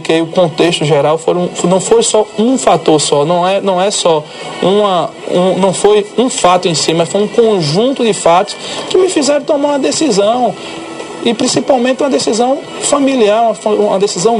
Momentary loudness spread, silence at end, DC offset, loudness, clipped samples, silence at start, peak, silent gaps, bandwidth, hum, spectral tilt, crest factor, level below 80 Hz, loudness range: 6 LU; 0 s; under 0.1%; -11 LUFS; 0.1%; 0 s; 0 dBFS; none; 11.5 kHz; none; -4 dB/octave; 12 dB; -52 dBFS; 2 LU